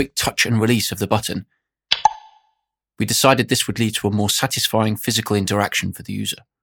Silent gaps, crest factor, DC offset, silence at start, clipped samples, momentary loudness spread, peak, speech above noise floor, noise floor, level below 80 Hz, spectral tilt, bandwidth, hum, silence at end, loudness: none; 20 dB; under 0.1%; 0 s; under 0.1%; 10 LU; 0 dBFS; 53 dB; -73 dBFS; -52 dBFS; -3.5 dB/octave; 20 kHz; none; 0.25 s; -19 LUFS